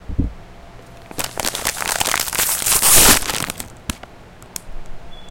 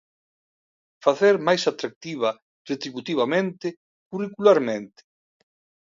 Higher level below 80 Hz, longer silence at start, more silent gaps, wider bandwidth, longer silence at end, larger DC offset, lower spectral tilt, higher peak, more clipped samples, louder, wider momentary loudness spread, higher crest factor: first, -32 dBFS vs -74 dBFS; second, 0.05 s vs 1.05 s; second, none vs 1.96-2.01 s, 2.42-2.65 s, 3.77-4.11 s; first, 17.5 kHz vs 7.6 kHz; second, 0 s vs 0.95 s; neither; second, -1 dB/octave vs -5 dB/octave; first, 0 dBFS vs -4 dBFS; neither; first, -15 LUFS vs -23 LUFS; first, 24 LU vs 14 LU; about the same, 20 dB vs 20 dB